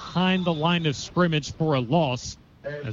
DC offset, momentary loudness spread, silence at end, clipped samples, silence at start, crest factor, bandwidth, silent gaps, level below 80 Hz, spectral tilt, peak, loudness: under 0.1%; 13 LU; 0 s; under 0.1%; 0 s; 16 dB; 7.6 kHz; none; -52 dBFS; -5.5 dB/octave; -10 dBFS; -24 LUFS